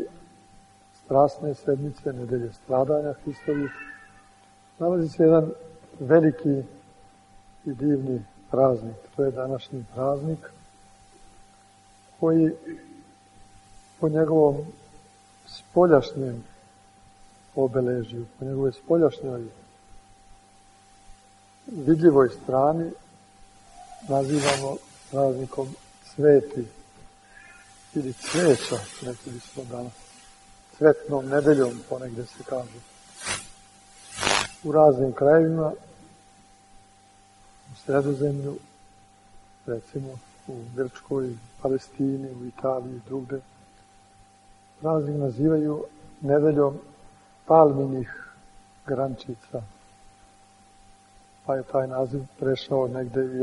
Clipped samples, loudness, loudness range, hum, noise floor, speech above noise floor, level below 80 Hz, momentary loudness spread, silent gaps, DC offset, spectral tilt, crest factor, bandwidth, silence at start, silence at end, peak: under 0.1%; -24 LUFS; 8 LU; none; -55 dBFS; 32 dB; -58 dBFS; 20 LU; none; under 0.1%; -6 dB/octave; 24 dB; 11.5 kHz; 0 s; 0 s; -2 dBFS